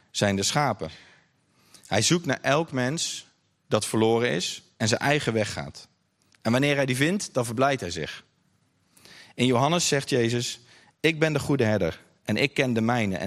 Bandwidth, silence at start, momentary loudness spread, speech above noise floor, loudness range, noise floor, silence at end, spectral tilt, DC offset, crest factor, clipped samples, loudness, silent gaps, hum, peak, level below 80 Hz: 15 kHz; 0.15 s; 11 LU; 43 dB; 2 LU; -67 dBFS; 0 s; -4.5 dB/octave; under 0.1%; 20 dB; under 0.1%; -25 LUFS; none; none; -6 dBFS; -62 dBFS